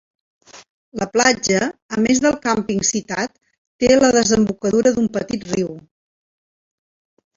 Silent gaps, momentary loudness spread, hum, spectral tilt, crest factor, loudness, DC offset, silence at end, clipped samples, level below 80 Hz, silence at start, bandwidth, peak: 0.70-0.92 s, 1.82-1.89 s, 3.58-3.79 s; 11 LU; none; -3.5 dB/octave; 18 dB; -18 LUFS; under 0.1%; 1.55 s; under 0.1%; -50 dBFS; 0.55 s; 7.8 kHz; -2 dBFS